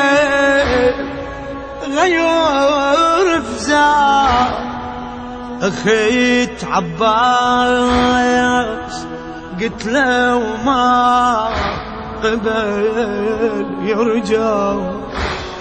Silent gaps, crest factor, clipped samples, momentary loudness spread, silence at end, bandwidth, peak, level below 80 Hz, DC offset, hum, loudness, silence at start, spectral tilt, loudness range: none; 14 dB; under 0.1%; 14 LU; 0 s; 9.4 kHz; 0 dBFS; -36 dBFS; under 0.1%; none; -15 LUFS; 0 s; -4.5 dB/octave; 4 LU